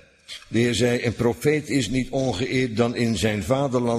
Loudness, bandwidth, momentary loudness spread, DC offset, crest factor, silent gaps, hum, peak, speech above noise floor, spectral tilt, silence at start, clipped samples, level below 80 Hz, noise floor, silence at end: -23 LUFS; 15.5 kHz; 4 LU; under 0.1%; 16 dB; none; none; -8 dBFS; 21 dB; -5.5 dB/octave; 0.3 s; under 0.1%; -46 dBFS; -43 dBFS; 0 s